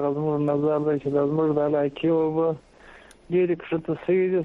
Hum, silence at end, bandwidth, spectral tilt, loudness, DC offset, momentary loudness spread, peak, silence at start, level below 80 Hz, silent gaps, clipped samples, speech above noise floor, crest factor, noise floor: none; 0 s; 10.5 kHz; -9.5 dB/octave; -24 LUFS; under 0.1%; 5 LU; -10 dBFS; 0 s; -58 dBFS; none; under 0.1%; 26 dB; 12 dB; -49 dBFS